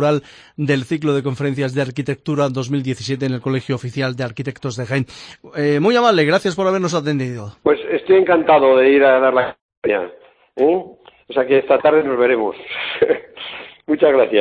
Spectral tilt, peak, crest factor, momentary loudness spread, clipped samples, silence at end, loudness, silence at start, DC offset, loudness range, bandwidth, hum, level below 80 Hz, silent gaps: -6.5 dB/octave; 0 dBFS; 16 dB; 13 LU; under 0.1%; 0 s; -17 LUFS; 0 s; under 0.1%; 7 LU; 10.5 kHz; none; -58 dBFS; 9.61-9.69 s, 9.77-9.82 s